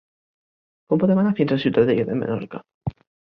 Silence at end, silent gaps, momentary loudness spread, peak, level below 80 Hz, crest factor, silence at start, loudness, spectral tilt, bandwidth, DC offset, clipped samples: 0.35 s; 2.74-2.81 s; 14 LU; -4 dBFS; -54 dBFS; 18 dB; 0.9 s; -20 LUFS; -10 dB/octave; 5.6 kHz; under 0.1%; under 0.1%